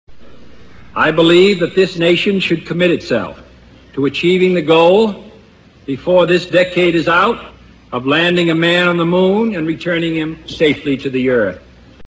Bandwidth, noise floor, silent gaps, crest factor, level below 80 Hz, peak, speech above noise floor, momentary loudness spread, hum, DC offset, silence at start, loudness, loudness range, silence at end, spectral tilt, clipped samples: 8 kHz; -44 dBFS; none; 14 dB; -46 dBFS; 0 dBFS; 31 dB; 12 LU; none; under 0.1%; 0.1 s; -13 LUFS; 2 LU; 0.15 s; -6 dB/octave; under 0.1%